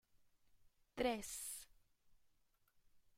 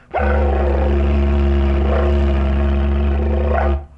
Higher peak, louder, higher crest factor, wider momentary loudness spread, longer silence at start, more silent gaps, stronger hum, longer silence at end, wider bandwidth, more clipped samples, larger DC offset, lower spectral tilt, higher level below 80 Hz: second, -26 dBFS vs -6 dBFS; second, -44 LUFS vs -17 LUFS; first, 24 dB vs 10 dB; first, 16 LU vs 2 LU; first, 0.65 s vs 0.15 s; neither; neither; about the same, 0.2 s vs 0.1 s; first, 16 kHz vs 4.1 kHz; neither; neither; second, -2.5 dB/octave vs -9.5 dB/octave; second, -70 dBFS vs -18 dBFS